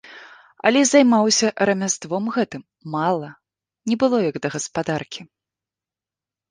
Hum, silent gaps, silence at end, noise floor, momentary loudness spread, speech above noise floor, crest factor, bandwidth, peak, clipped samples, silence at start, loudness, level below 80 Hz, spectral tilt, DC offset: none; none; 1.25 s; -90 dBFS; 16 LU; 70 dB; 20 dB; 10 kHz; -2 dBFS; under 0.1%; 0.05 s; -20 LUFS; -64 dBFS; -3.5 dB/octave; under 0.1%